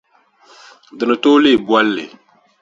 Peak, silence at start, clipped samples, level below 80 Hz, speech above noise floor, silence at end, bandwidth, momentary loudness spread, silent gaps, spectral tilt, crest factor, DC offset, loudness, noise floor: 0 dBFS; 0.95 s; under 0.1%; -60 dBFS; 37 dB; 0.55 s; 7.6 kHz; 13 LU; none; -5 dB/octave; 16 dB; under 0.1%; -14 LUFS; -51 dBFS